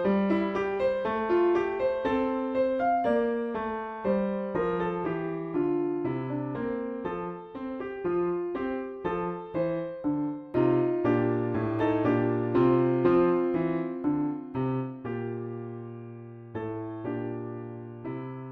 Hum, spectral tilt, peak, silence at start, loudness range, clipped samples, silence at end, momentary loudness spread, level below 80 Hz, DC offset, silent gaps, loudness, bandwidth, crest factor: none; -9.5 dB/octave; -12 dBFS; 0 s; 8 LU; under 0.1%; 0 s; 13 LU; -58 dBFS; under 0.1%; none; -29 LUFS; 5.6 kHz; 18 dB